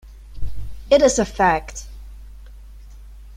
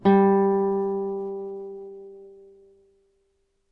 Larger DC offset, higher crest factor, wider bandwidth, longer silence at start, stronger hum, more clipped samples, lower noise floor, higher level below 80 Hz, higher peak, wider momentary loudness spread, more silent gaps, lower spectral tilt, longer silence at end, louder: neither; about the same, 20 dB vs 18 dB; first, 15.5 kHz vs 4.2 kHz; about the same, 0.05 s vs 0.05 s; neither; neither; second, -40 dBFS vs -70 dBFS; first, -36 dBFS vs -66 dBFS; first, -2 dBFS vs -8 dBFS; about the same, 23 LU vs 23 LU; neither; second, -4 dB/octave vs -10.5 dB/octave; second, 0 s vs 1.4 s; first, -17 LUFS vs -23 LUFS